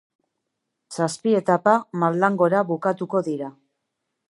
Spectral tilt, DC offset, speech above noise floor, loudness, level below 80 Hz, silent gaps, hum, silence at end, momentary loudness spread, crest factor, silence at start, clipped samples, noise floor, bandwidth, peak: -6.5 dB/octave; under 0.1%; 58 dB; -22 LUFS; -74 dBFS; none; none; 0.8 s; 11 LU; 20 dB; 0.9 s; under 0.1%; -79 dBFS; 11.5 kHz; -4 dBFS